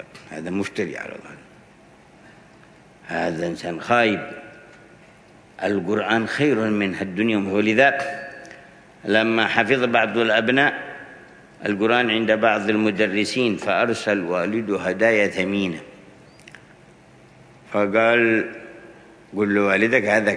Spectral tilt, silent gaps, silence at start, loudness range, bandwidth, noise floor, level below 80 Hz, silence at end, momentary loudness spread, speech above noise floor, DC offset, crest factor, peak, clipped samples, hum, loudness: -5.5 dB/octave; none; 0 s; 6 LU; 10.5 kHz; -50 dBFS; -64 dBFS; 0 s; 17 LU; 30 dB; under 0.1%; 22 dB; 0 dBFS; under 0.1%; none; -20 LUFS